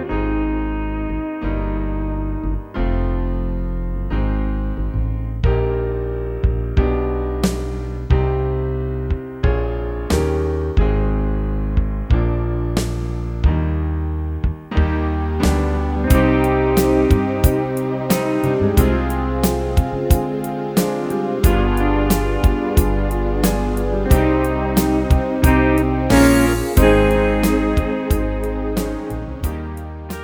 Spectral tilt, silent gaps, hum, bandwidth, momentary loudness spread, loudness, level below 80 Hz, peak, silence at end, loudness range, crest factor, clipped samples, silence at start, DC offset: -6.5 dB/octave; none; none; over 20 kHz; 9 LU; -19 LUFS; -22 dBFS; 0 dBFS; 0 s; 7 LU; 18 dB; under 0.1%; 0 s; under 0.1%